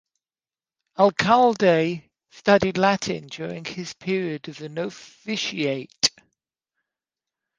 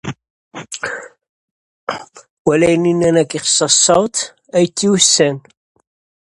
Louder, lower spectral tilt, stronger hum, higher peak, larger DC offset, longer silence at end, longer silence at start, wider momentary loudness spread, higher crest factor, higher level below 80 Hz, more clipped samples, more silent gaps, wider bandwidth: second, -22 LUFS vs -14 LUFS; about the same, -4 dB/octave vs -3 dB/octave; neither; about the same, -2 dBFS vs 0 dBFS; neither; first, 1.5 s vs 0.8 s; first, 1 s vs 0.05 s; second, 15 LU vs 19 LU; first, 22 dB vs 16 dB; second, -60 dBFS vs -54 dBFS; neither; second, none vs 0.30-0.51 s, 1.29-1.87 s, 2.30-2.45 s; second, 10 kHz vs 11.5 kHz